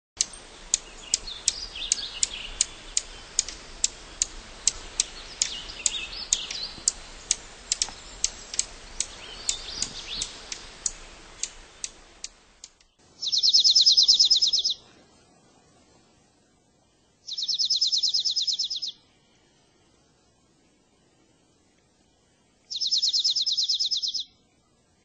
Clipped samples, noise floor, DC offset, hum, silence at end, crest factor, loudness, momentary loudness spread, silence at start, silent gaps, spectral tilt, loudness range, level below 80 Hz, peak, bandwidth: under 0.1%; -64 dBFS; under 0.1%; none; 0.8 s; 26 dB; -24 LUFS; 18 LU; 0.15 s; none; 2 dB/octave; 13 LU; -52 dBFS; -2 dBFS; 9.6 kHz